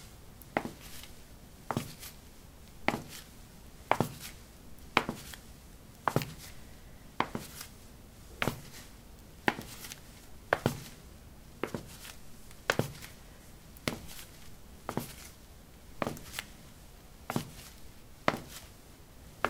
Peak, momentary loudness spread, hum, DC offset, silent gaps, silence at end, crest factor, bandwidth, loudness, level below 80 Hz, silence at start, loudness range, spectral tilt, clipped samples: -2 dBFS; 21 LU; none; under 0.1%; none; 0 s; 38 dB; 18 kHz; -37 LUFS; -56 dBFS; 0 s; 5 LU; -4.5 dB/octave; under 0.1%